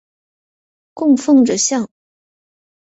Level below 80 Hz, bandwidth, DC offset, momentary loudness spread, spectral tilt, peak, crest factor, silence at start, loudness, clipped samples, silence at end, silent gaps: -62 dBFS; 8.2 kHz; under 0.1%; 10 LU; -3.5 dB/octave; -2 dBFS; 16 dB; 0.95 s; -14 LUFS; under 0.1%; 1 s; none